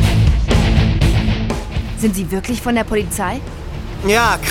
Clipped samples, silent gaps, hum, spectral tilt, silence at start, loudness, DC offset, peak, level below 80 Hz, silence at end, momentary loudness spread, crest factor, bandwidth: under 0.1%; none; none; -5.5 dB/octave; 0 s; -17 LUFS; under 0.1%; 0 dBFS; -20 dBFS; 0 s; 10 LU; 16 dB; 17 kHz